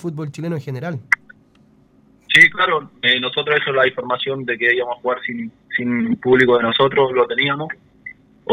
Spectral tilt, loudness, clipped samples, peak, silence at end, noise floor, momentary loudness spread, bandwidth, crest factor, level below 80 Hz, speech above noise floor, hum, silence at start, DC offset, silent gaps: -5 dB/octave; -17 LUFS; under 0.1%; 0 dBFS; 0 s; -53 dBFS; 15 LU; 15 kHz; 18 dB; -58 dBFS; 35 dB; none; 0.05 s; under 0.1%; none